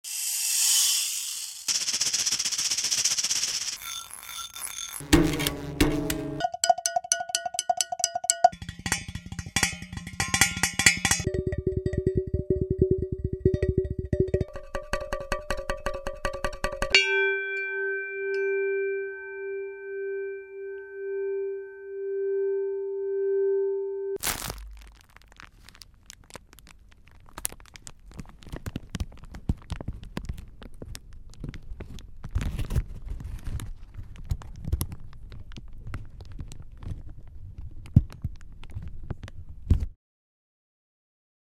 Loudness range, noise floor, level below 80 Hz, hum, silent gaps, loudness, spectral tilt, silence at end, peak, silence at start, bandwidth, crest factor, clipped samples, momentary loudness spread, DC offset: 14 LU; -53 dBFS; -40 dBFS; none; none; -27 LUFS; -3 dB/octave; 1.6 s; 0 dBFS; 0.05 s; 17 kHz; 30 dB; under 0.1%; 22 LU; under 0.1%